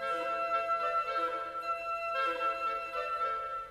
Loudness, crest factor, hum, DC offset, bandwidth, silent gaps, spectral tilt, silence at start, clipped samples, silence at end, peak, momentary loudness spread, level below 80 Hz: -33 LUFS; 12 dB; 50 Hz at -70 dBFS; under 0.1%; 13 kHz; none; -3 dB/octave; 0 s; under 0.1%; 0 s; -22 dBFS; 5 LU; -66 dBFS